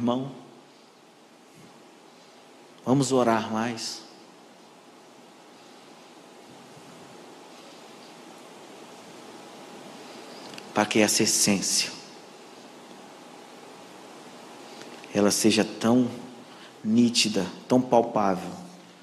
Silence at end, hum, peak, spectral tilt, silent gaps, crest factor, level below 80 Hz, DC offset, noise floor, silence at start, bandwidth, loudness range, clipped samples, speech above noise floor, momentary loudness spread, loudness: 0.2 s; none; -6 dBFS; -3.5 dB/octave; none; 24 dB; -72 dBFS; under 0.1%; -54 dBFS; 0 s; 14 kHz; 22 LU; under 0.1%; 30 dB; 25 LU; -24 LUFS